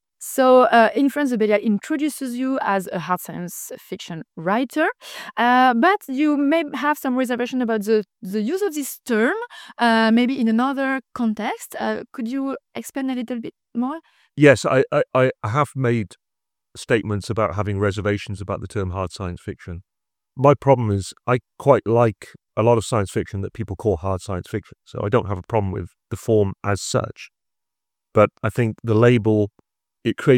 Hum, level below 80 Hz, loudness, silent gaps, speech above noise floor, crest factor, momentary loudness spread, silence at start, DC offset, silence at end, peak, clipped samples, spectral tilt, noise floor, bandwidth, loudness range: none; -52 dBFS; -21 LUFS; none; 67 dB; 20 dB; 15 LU; 0.2 s; under 0.1%; 0 s; 0 dBFS; under 0.1%; -6 dB/octave; -87 dBFS; 17 kHz; 5 LU